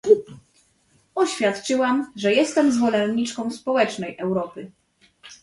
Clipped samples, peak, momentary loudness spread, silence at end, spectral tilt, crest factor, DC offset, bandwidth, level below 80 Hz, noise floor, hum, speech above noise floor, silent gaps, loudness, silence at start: under 0.1%; -4 dBFS; 9 LU; 0.1 s; -4.5 dB/octave; 18 dB; under 0.1%; 11.5 kHz; -64 dBFS; -62 dBFS; none; 40 dB; none; -22 LUFS; 0.05 s